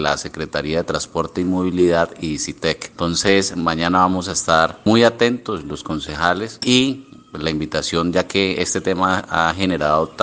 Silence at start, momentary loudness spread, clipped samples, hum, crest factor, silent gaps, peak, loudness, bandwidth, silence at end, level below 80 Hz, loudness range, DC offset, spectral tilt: 0 s; 9 LU; under 0.1%; none; 18 dB; none; 0 dBFS; -19 LUFS; 10 kHz; 0 s; -46 dBFS; 3 LU; under 0.1%; -4 dB/octave